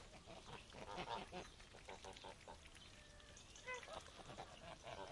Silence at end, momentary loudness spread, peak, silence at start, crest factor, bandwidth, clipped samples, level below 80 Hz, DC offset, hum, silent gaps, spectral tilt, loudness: 0 s; 10 LU; -34 dBFS; 0 s; 22 dB; 12 kHz; under 0.1%; -68 dBFS; under 0.1%; none; none; -3 dB/octave; -55 LUFS